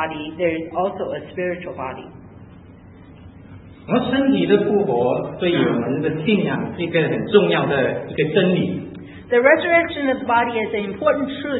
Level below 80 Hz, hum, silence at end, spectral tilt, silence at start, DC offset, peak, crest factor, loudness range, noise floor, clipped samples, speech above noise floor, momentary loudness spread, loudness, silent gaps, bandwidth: -54 dBFS; none; 0 s; -11.5 dB/octave; 0 s; under 0.1%; 0 dBFS; 20 dB; 9 LU; -43 dBFS; under 0.1%; 24 dB; 12 LU; -19 LUFS; none; 4.1 kHz